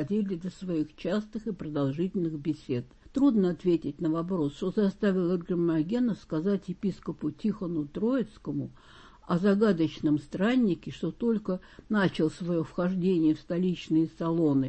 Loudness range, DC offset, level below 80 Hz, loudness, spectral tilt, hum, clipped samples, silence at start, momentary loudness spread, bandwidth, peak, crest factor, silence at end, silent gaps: 3 LU; under 0.1%; -56 dBFS; -29 LUFS; -8 dB/octave; none; under 0.1%; 0 s; 9 LU; 8.6 kHz; -12 dBFS; 16 dB; 0 s; none